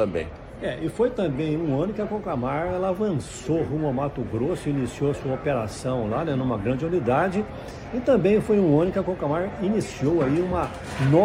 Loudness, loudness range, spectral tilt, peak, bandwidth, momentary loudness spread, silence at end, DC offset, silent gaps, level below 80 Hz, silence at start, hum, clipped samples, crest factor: -25 LUFS; 4 LU; -7.5 dB/octave; -6 dBFS; 12 kHz; 9 LU; 0 s; under 0.1%; none; -44 dBFS; 0 s; none; under 0.1%; 18 dB